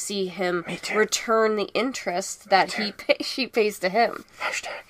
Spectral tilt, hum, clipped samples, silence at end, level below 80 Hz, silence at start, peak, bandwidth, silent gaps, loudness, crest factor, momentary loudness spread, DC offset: -3 dB/octave; none; under 0.1%; 0.1 s; -66 dBFS; 0 s; -4 dBFS; 15.5 kHz; none; -24 LUFS; 20 dB; 7 LU; under 0.1%